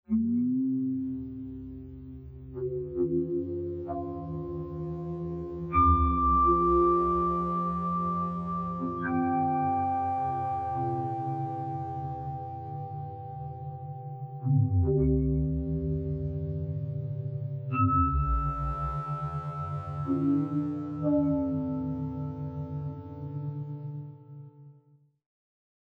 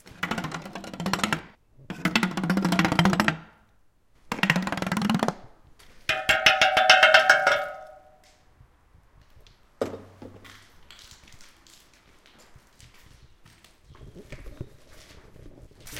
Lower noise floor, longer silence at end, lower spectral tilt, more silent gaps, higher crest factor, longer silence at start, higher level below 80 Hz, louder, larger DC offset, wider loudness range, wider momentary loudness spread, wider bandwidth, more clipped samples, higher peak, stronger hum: about the same, -62 dBFS vs -61 dBFS; first, 1.2 s vs 0 s; first, -11.5 dB/octave vs -4 dB/octave; neither; second, 18 dB vs 26 dB; about the same, 0.1 s vs 0.2 s; first, -40 dBFS vs -54 dBFS; second, -30 LUFS vs -22 LUFS; neither; second, 9 LU vs 22 LU; second, 15 LU vs 27 LU; second, 4.2 kHz vs 17 kHz; neither; second, -12 dBFS vs 0 dBFS; neither